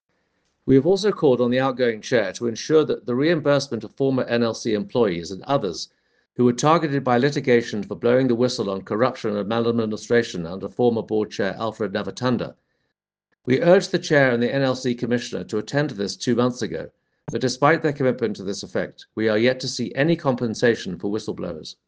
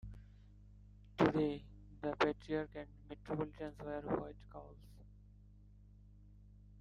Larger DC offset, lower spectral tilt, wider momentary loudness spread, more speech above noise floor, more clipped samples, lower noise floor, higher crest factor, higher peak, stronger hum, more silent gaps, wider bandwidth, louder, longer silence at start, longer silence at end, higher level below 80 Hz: neither; second, -5.5 dB/octave vs -7.5 dB/octave; second, 11 LU vs 27 LU; first, 56 dB vs 21 dB; neither; first, -78 dBFS vs -61 dBFS; second, 20 dB vs 28 dB; first, -2 dBFS vs -14 dBFS; second, none vs 50 Hz at -60 dBFS; neither; first, 9.6 kHz vs 8 kHz; first, -22 LUFS vs -40 LUFS; first, 0.65 s vs 0.05 s; first, 0.15 s vs 0 s; about the same, -60 dBFS vs -60 dBFS